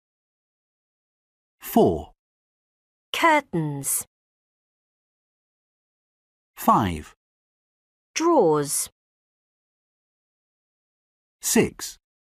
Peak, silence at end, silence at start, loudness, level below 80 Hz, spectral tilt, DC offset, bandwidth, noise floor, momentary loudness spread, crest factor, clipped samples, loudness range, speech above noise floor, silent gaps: -6 dBFS; 0.4 s; 1.65 s; -22 LUFS; -54 dBFS; -4 dB/octave; under 0.1%; 15.5 kHz; under -90 dBFS; 15 LU; 22 dB; under 0.1%; 5 LU; over 69 dB; 2.19-3.13 s, 4.07-6.54 s, 7.16-8.14 s, 8.92-11.39 s